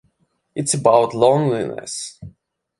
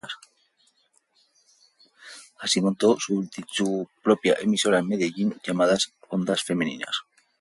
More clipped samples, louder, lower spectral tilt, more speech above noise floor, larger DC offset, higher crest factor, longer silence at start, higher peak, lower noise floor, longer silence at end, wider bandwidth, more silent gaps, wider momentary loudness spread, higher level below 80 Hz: neither; first, -18 LUFS vs -24 LUFS; about the same, -5 dB/octave vs -4 dB/octave; first, 48 dB vs 43 dB; neither; about the same, 20 dB vs 20 dB; first, 0.55 s vs 0.05 s; first, 0 dBFS vs -6 dBFS; about the same, -66 dBFS vs -66 dBFS; about the same, 0.5 s vs 0.4 s; about the same, 11.5 kHz vs 11.5 kHz; neither; first, 15 LU vs 11 LU; first, -56 dBFS vs -68 dBFS